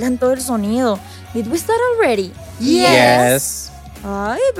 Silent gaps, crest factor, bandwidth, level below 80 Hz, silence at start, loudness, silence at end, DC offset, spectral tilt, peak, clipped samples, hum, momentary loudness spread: none; 14 dB; 17 kHz; -42 dBFS; 0 s; -15 LUFS; 0 s; under 0.1%; -4 dB/octave; -2 dBFS; under 0.1%; none; 16 LU